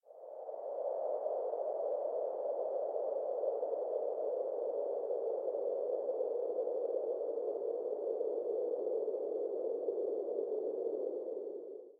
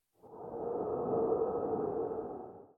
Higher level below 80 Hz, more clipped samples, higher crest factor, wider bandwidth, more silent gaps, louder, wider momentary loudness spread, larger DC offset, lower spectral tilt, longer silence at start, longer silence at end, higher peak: second, under -90 dBFS vs -66 dBFS; neither; about the same, 12 dB vs 16 dB; about the same, 1.9 kHz vs 2 kHz; neither; about the same, -38 LUFS vs -36 LUFS; second, 3 LU vs 14 LU; neither; second, -8 dB/octave vs -12 dB/octave; second, 0.05 s vs 0.25 s; about the same, 0.05 s vs 0.1 s; second, -24 dBFS vs -20 dBFS